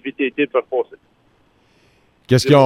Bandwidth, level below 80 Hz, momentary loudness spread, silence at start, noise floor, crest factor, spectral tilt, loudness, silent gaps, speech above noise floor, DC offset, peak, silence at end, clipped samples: 15.5 kHz; -54 dBFS; 8 LU; 0.05 s; -58 dBFS; 16 dB; -6 dB/octave; -19 LUFS; none; 42 dB; under 0.1%; -2 dBFS; 0 s; under 0.1%